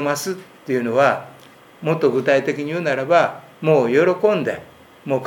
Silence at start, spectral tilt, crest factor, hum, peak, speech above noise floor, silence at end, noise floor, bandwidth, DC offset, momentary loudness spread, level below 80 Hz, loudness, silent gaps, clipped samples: 0 s; -5.5 dB/octave; 18 dB; none; -2 dBFS; 28 dB; 0 s; -46 dBFS; 18 kHz; under 0.1%; 11 LU; -66 dBFS; -19 LUFS; none; under 0.1%